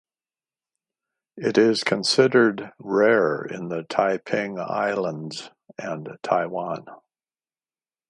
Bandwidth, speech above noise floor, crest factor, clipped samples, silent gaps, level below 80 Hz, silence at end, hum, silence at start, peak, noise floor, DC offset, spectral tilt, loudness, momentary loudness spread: 11.5 kHz; over 67 dB; 22 dB; under 0.1%; none; -72 dBFS; 1.15 s; none; 1.35 s; -4 dBFS; under -90 dBFS; under 0.1%; -4.5 dB/octave; -23 LUFS; 16 LU